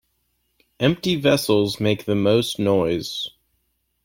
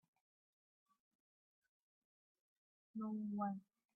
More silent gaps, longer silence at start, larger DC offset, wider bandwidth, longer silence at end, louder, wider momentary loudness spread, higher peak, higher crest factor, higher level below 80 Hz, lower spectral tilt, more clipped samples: neither; second, 0.8 s vs 2.95 s; neither; first, 16.5 kHz vs 1.8 kHz; first, 0.75 s vs 0.35 s; first, -21 LUFS vs -46 LUFS; about the same, 8 LU vs 10 LU; first, -4 dBFS vs -30 dBFS; about the same, 18 dB vs 20 dB; first, -54 dBFS vs under -90 dBFS; about the same, -5.5 dB/octave vs -6.5 dB/octave; neither